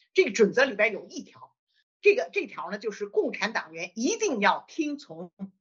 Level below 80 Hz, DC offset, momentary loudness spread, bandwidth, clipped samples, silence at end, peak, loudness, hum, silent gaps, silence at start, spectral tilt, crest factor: -80 dBFS; under 0.1%; 17 LU; 7.6 kHz; under 0.1%; 0.1 s; -8 dBFS; -26 LUFS; none; 1.59-1.67 s, 1.83-2.00 s, 5.33-5.37 s; 0.15 s; -2.5 dB/octave; 20 dB